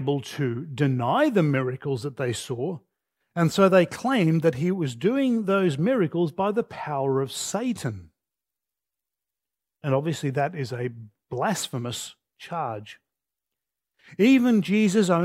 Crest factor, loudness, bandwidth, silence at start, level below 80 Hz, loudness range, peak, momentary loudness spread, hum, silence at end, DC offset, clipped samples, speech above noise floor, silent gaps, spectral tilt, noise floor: 20 dB; -24 LUFS; 16 kHz; 0 s; -68 dBFS; 8 LU; -4 dBFS; 13 LU; none; 0 s; under 0.1%; under 0.1%; 65 dB; none; -6 dB/octave; -89 dBFS